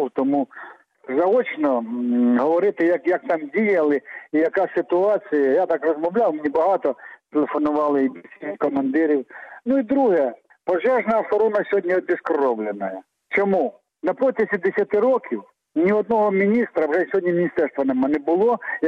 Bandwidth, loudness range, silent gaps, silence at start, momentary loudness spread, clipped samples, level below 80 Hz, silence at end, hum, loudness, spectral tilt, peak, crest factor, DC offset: 6.2 kHz; 2 LU; none; 0 s; 8 LU; under 0.1%; -66 dBFS; 0 s; none; -21 LUFS; -8.5 dB/octave; -10 dBFS; 10 dB; under 0.1%